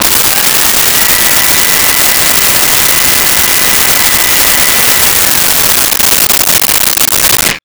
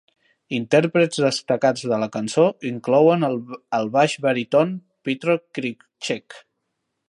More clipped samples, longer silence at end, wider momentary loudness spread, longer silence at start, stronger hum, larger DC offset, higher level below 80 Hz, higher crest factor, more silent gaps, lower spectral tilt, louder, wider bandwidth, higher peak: neither; second, 0.05 s vs 0.7 s; second, 1 LU vs 12 LU; second, 0 s vs 0.5 s; neither; neither; first, -32 dBFS vs -72 dBFS; second, 8 dB vs 18 dB; neither; second, 0 dB/octave vs -5.5 dB/octave; first, -4 LUFS vs -21 LUFS; first, over 20 kHz vs 11.5 kHz; about the same, 0 dBFS vs -2 dBFS